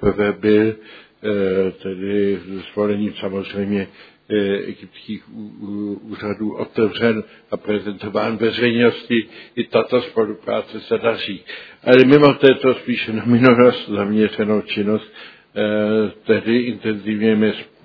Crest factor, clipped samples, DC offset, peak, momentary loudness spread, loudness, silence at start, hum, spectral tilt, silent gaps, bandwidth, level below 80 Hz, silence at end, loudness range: 18 dB; under 0.1%; under 0.1%; 0 dBFS; 16 LU; -18 LUFS; 0 s; none; -8.5 dB/octave; none; 5.4 kHz; -54 dBFS; 0.2 s; 9 LU